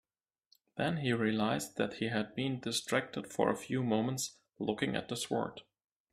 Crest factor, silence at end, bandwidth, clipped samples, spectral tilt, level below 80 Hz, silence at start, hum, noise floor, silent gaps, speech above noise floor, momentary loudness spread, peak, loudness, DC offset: 20 dB; 0.5 s; 14.5 kHz; under 0.1%; -4.5 dB/octave; -70 dBFS; 0.75 s; none; -74 dBFS; none; 39 dB; 8 LU; -14 dBFS; -35 LUFS; under 0.1%